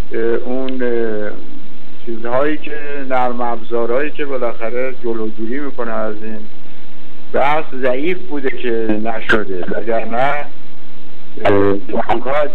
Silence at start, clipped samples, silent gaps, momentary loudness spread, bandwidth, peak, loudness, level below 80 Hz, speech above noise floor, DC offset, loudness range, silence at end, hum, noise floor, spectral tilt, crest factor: 0 s; under 0.1%; none; 12 LU; 8.6 kHz; -2 dBFS; -19 LUFS; -48 dBFS; 23 dB; 40%; 3 LU; 0 s; none; -42 dBFS; -7.5 dB/octave; 18 dB